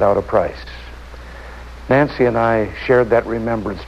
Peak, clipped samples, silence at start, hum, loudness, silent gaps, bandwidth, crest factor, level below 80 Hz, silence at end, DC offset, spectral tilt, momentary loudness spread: -4 dBFS; under 0.1%; 0 s; none; -17 LUFS; none; 12 kHz; 14 dB; -36 dBFS; 0 s; under 0.1%; -8 dB/octave; 21 LU